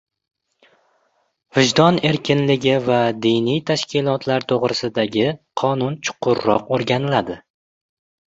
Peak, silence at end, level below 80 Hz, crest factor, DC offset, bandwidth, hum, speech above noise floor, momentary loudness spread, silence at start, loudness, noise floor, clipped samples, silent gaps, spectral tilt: -2 dBFS; 0.9 s; -56 dBFS; 18 dB; under 0.1%; 8 kHz; none; 47 dB; 7 LU; 1.55 s; -19 LUFS; -65 dBFS; under 0.1%; none; -5.5 dB/octave